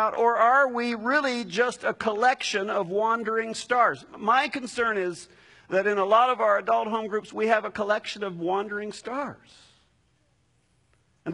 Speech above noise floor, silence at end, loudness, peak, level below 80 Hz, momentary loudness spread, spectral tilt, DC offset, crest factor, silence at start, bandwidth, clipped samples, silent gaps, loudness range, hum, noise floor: 42 dB; 0 s; -25 LUFS; -6 dBFS; -68 dBFS; 12 LU; -3.5 dB/octave; under 0.1%; 20 dB; 0 s; 11 kHz; under 0.1%; none; 6 LU; none; -67 dBFS